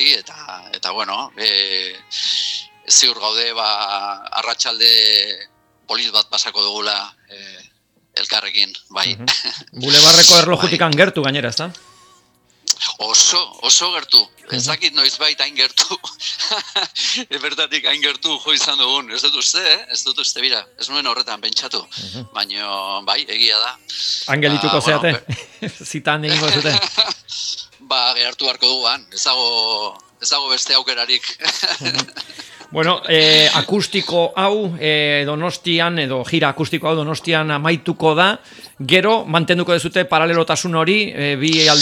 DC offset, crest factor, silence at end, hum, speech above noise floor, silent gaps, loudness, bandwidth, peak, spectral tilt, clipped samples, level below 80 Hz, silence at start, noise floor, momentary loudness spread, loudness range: under 0.1%; 18 dB; 0 s; none; 38 dB; none; -15 LUFS; over 20 kHz; 0 dBFS; -2 dB/octave; under 0.1%; -62 dBFS; 0 s; -55 dBFS; 12 LU; 7 LU